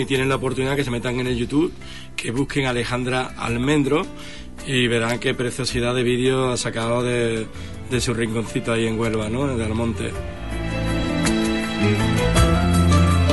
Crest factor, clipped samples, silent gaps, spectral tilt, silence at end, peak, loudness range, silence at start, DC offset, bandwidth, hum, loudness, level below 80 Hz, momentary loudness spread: 16 dB; under 0.1%; none; -5.5 dB/octave; 0 s; -4 dBFS; 3 LU; 0 s; 1%; 11.5 kHz; none; -21 LUFS; -34 dBFS; 10 LU